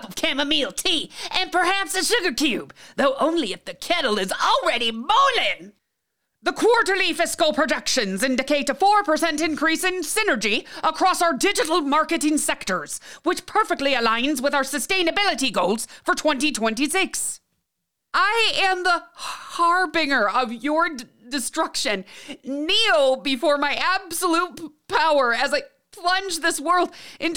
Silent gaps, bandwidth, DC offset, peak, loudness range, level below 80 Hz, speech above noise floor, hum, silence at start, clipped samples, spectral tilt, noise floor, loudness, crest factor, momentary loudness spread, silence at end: none; over 20 kHz; 0.9%; -6 dBFS; 2 LU; -54 dBFS; 58 dB; none; 0 s; under 0.1%; -1.5 dB/octave; -79 dBFS; -21 LUFS; 16 dB; 9 LU; 0 s